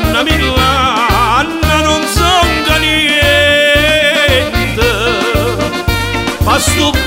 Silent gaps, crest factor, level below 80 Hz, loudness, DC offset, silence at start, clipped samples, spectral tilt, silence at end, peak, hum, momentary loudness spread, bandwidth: none; 10 dB; -22 dBFS; -10 LUFS; under 0.1%; 0 s; under 0.1%; -3.5 dB/octave; 0 s; 0 dBFS; none; 6 LU; 16.5 kHz